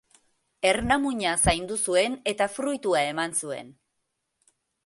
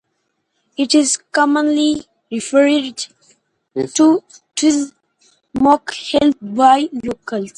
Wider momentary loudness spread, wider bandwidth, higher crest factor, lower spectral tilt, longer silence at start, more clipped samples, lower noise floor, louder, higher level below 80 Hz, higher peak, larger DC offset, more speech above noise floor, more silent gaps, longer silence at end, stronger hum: second, 6 LU vs 14 LU; about the same, 12 kHz vs 11.5 kHz; about the same, 20 dB vs 16 dB; about the same, -3 dB/octave vs -3 dB/octave; second, 0.6 s vs 0.8 s; neither; first, -79 dBFS vs -70 dBFS; second, -25 LUFS vs -16 LUFS; first, -46 dBFS vs -54 dBFS; second, -6 dBFS vs 0 dBFS; neither; about the same, 53 dB vs 55 dB; neither; first, 1.15 s vs 0.05 s; neither